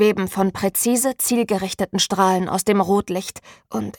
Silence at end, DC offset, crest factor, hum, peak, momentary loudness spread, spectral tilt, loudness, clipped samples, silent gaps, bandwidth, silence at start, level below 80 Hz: 0.05 s; under 0.1%; 16 dB; none; -4 dBFS; 9 LU; -4 dB/octave; -20 LUFS; under 0.1%; none; 19 kHz; 0 s; -54 dBFS